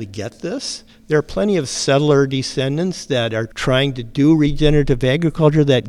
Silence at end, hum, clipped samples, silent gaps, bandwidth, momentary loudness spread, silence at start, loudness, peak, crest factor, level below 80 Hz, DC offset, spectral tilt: 0 s; none; under 0.1%; none; 12 kHz; 11 LU; 0 s; -17 LUFS; 0 dBFS; 16 dB; -32 dBFS; under 0.1%; -6 dB/octave